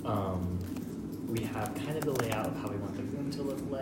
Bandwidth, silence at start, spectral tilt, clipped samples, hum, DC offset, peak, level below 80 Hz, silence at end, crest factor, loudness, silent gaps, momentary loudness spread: 16.5 kHz; 0 s; -6.5 dB/octave; under 0.1%; none; under 0.1%; -12 dBFS; -58 dBFS; 0 s; 22 dB; -35 LUFS; none; 6 LU